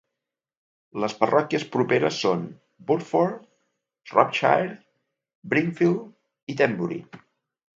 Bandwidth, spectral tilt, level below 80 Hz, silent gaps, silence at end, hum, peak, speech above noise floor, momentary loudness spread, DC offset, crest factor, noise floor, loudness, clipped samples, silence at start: 7.8 kHz; -6 dB/octave; -72 dBFS; 5.35-5.42 s, 6.43-6.47 s; 0.6 s; none; -2 dBFS; 63 dB; 15 LU; under 0.1%; 24 dB; -86 dBFS; -24 LUFS; under 0.1%; 0.95 s